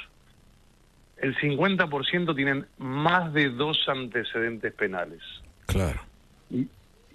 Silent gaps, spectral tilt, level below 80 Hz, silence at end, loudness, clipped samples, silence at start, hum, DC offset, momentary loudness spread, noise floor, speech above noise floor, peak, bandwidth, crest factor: none; -5.5 dB/octave; -46 dBFS; 0.45 s; -27 LUFS; under 0.1%; 0 s; none; under 0.1%; 13 LU; -58 dBFS; 31 dB; -8 dBFS; 13 kHz; 20 dB